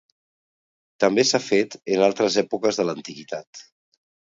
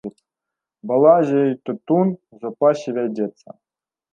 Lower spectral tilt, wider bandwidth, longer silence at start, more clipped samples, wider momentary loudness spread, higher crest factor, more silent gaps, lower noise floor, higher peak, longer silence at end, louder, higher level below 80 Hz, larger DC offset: second, -3.5 dB/octave vs -8.5 dB/octave; about the same, 7.8 kHz vs 7.6 kHz; first, 1 s vs 0.05 s; neither; about the same, 15 LU vs 17 LU; about the same, 20 dB vs 18 dB; first, 3.47-3.53 s vs none; first, under -90 dBFS vs -85 dBFS; about the same, -4 dBFS vs -2 dBFS; about the same, 0.75 s vs 0.85 s; about the same, -21 LUFS vs -19 LUFS; about the same, -70 dBFS vs -74 dBFS; neither